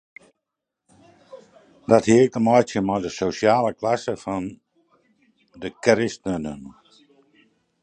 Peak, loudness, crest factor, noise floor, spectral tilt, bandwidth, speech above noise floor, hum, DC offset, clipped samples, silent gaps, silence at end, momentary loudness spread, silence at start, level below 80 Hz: -2 dBFS; -21 LUFS; 22 dB; -83 dBFS; -5.5 dB/octave; 9.4 kHz; 62 dB; none; under 0.1%; under 0.1%; none; 1.1 s; 18 LU; 1.35 s; -56 dBFS